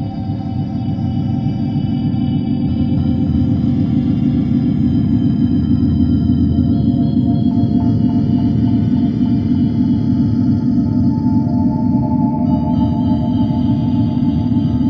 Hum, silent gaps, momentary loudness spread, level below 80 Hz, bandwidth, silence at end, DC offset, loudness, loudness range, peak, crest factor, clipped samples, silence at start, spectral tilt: none; none; 4 LU; -30 dBFS; 5.4 kHz; 0 s; under 0.1%; -15 LUFS; 2 LU; -2 dBFS; 12 dB; under 0.1%; 0 s; -11 dB/octave